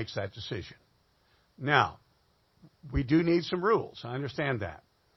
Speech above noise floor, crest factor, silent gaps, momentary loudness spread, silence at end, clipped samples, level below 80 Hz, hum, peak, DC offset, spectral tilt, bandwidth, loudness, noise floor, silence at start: 39 dB; 24 dB; none; 13 LU; 0.4 s; under 0.1%; -48 dBFS; none; -6 dBFS; under 0.1%; -7 dB/octave; 6.2 kHz; -30 LUFS; -69 dBFS; 0 s